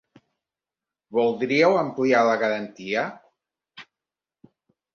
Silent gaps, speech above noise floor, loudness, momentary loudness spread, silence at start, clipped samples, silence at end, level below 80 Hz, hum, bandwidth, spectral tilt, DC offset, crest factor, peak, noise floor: none; 68 dB; -22 LUFS; 9 LU; 1.1 s; under 0.1%; 1.15 s; -70 dBFS; none; 7 kHz; -5.5 dB/octave; under 0.1%; 20 dB; -6 dBFS; -90 dBFS